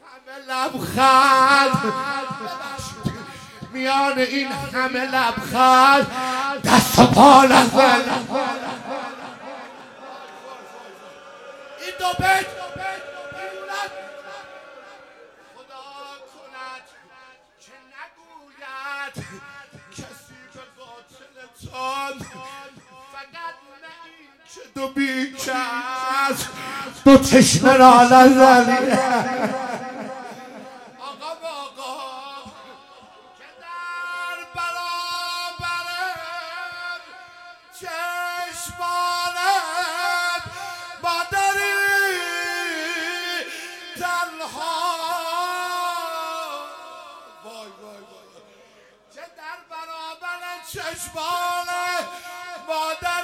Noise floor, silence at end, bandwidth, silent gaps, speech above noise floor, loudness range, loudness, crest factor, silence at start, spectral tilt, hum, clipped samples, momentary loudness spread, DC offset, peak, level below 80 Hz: -53 dBFS; 0 s; 16.5 kHz; none; 38 dB; 23 LU; -18 LUFS; 20 dB; 0.1 s; -3.5 dB/octave; none; under 0.1%; 26 LU; under 0.1%; 0 dBFS; -52 dBFS